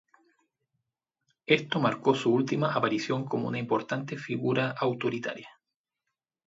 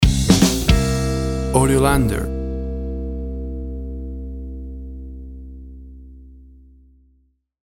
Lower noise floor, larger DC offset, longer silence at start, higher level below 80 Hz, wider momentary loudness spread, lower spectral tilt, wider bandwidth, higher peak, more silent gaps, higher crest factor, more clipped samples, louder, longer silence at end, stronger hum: first, -87 dBFS vs -61 dBFS; neither; first, 1.5 s vs 0 s; second, -74 dBFS vs -26 dBFS; second, 9 LU vs 22 LU; about the same, -6 dB/octave vs -5.5 dB/octave; second, 8 kHz vs 18.5 kHz; second, -8 dBFS vs -2 dBFS; neither; about the same, 22 dB vs 20 dB; neither; second, -28 LUFS vs -20 LUFS; second, 1 s vs 1.2 s; neither